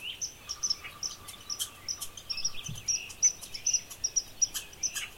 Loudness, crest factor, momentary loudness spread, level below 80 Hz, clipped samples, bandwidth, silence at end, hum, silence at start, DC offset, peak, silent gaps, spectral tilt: -31 LUFS; 20 dB; 11 LU; -58 dBFS; under 0.1%; 16.5 kHz; 0 s; none; 0 s; under 0.1%; -14 dBFS; none; 1 dB/octave